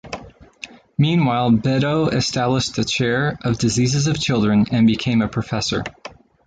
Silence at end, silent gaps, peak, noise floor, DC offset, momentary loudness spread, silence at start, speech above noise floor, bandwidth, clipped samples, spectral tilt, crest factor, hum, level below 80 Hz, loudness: 0.4 s; none; -6 dBFS; -40 dBFS; under 0.1%; 17 LU; 0.05 s; 22 dB; 9.2 kHz; under 0.1%; -5.5 dB/octave; 14 dB; none; -46 dBFS; -19 LUFS